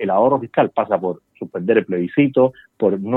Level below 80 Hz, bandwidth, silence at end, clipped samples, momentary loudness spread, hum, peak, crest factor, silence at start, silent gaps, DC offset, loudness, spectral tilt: -68 dBFS; 4 kHz; 0 s; under 0.1%; 10 LU; none; -2 dBFS; 16 dB; 0 s; none; under 0.1%; -18 LUFS; -10 dB/octave